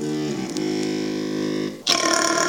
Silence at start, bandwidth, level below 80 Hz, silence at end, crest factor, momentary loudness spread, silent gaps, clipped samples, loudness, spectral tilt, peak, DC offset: 0 s; over 20 kHz; -62 dBFS; 0 s; 16 dB; 8 LU; none; under 0.1%; -23 LUFS; -2.5 dB/octave; -6 dBFS; under 0.1%